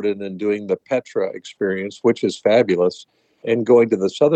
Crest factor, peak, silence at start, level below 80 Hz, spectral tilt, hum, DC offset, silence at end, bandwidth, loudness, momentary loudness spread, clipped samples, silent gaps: 16 dB; -2 dBFS; 0 s; -72 dBFS; -6 dB/octave; none; under 0.1%; 0 s; 8.6 kHz; -19 LUFS; 10 LU; under 0.1%; none